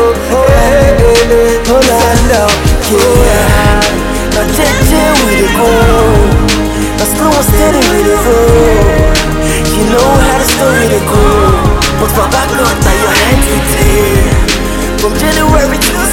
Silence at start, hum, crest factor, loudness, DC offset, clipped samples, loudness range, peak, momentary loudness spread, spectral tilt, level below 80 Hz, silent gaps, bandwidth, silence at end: 0 s; none; 8 dB; -8 LUFS; under 0.1%; 1%; 2 LU; 0 dBFS; 4 LU; -4.5 dB/octave; -14 dBFS; none; 17.5 kHz; 0 s